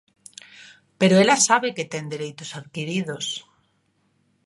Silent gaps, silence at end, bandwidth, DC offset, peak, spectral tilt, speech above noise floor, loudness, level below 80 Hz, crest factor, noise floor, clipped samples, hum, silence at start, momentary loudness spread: none; 1.05 s; 11.5 kHz; under 0.1%; -2 dBFS; -3.5 dB/octave; 46 dB; -21 LUFS; -70 dBFS; 22 dB; -67 dBFS; under 0.1%; none; 0.6 s; 21 LU